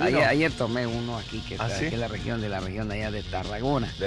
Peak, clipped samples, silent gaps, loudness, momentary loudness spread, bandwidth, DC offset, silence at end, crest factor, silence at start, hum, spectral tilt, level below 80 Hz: -10 dBFS; under 0.1%; none; -28 LUFS; 10 LU; 11.5 kHz; under 0.1%; 0 s; 16 dB; 0 s; none; -6 dB/octave; -42 dBFS